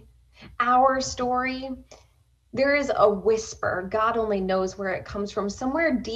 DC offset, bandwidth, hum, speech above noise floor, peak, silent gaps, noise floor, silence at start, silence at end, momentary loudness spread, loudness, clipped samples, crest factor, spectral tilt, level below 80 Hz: under 0.1%; 9.2 kHz; none; 26 dB; -8 dBFS; none; -50 dBFS; 0.4 s; 0 s; 10 LU; -24 LUFS; under 0.1%; 18 dB; -4.5 dB/octave; -50 dBFS